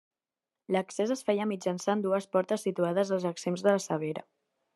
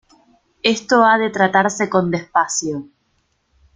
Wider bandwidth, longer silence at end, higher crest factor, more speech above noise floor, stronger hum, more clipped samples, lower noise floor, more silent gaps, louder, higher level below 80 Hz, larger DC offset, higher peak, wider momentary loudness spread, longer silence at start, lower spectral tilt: first, 12.5 kHz vs 9.6 kHz; second, 0.55 s vs 0.9 s; about the same, 20 dB vs 18 dB; first, over 61 dB vs 49 dB; neither; neither; first, under -90 dBFS vs -65 dBFS; neither; second, -30 LUFS vs -17 LUFS; second, -82 dBFS vs -60 dBFS; neither; second, -10 dBFS vs 0 dBFS; second, 5 LU vs 8 LU; about the same, 0.7 s vs 0.65 s; first, -5.5 dB/octave vs -3.5 dB/octave